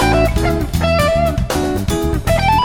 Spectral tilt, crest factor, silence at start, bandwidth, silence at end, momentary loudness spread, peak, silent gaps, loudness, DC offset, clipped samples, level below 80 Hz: -5.5 dB/octave; 12 dB; 0 s; 18.5 kHz; 0 s; 4 LU; -2 dBFS; none; -16 LUFS; under 0.1%; under 0.1%; -22 dBFS